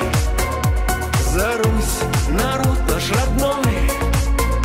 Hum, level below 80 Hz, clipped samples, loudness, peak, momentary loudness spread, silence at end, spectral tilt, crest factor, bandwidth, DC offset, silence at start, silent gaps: none; -22 dBFS; under 0.1%; -19 LUFS; -6 dBFS; 2 LU; 0 s; -5 dB/octave; 12 dB; 16.5 kHz; under 0.1%; 0 s; none